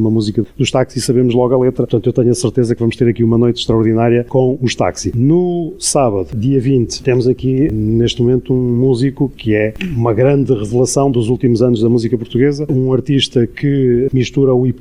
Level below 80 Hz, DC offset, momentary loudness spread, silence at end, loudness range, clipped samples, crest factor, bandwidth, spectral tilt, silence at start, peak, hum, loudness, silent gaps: -38 dBFS; 1%; 4 LU; 0 s; 1 LU; under 0.1%; 12 dB; 13 kHz; -6.5 dB/octave; 0 s; 0 dBFS; none; -14 LUFS; none